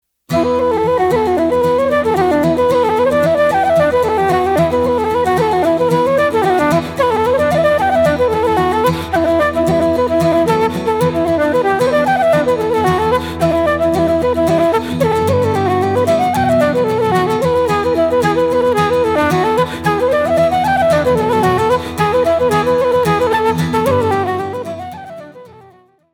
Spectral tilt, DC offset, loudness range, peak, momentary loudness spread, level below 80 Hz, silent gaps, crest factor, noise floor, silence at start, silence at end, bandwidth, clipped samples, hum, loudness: -6 dB/octave; under 0.1%; 1 LU; -2 dBFS; 3 LU; -38 dBFS; none; 12 dB; -46 dBFS; 0.3 s; 0.65 s; 18 kHz; under 0.1%; none; -14 LUFS